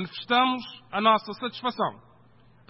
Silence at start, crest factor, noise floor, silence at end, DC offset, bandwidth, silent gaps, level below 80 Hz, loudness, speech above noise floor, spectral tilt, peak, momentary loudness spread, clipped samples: 0 s; 20 dB; -58 dBFS; 0.75 s; under 0.1%; 5.8 kHz; none; -68 dBFS; -26 LUFS; 31 dB; -8.5 dB/octave; -8 dBFS; 11 LU; under 0.1%